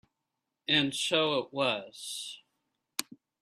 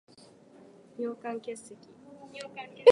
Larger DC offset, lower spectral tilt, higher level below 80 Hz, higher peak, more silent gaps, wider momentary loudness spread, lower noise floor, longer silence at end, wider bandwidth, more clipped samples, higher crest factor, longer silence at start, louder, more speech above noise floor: neither; about the same, -3 dB/octave vs -4 dB/octave; first, -74 dBFS vs -84 dBFS; about the same, -8 dBFS vs -6 dBFS; neither; second, 14 LU vs 19 LU; first, -86 dBFS vs -56 dBFS; first, 0.4 s vs 0 s; first, 15 kHz vs 11.5 kHz; neither; about the same, 26 dB vs 24 dB; second, 0.7 s vs 1 s; first, -30 LUFS vs -33 LUFS; first, 55 dB vs 28 dB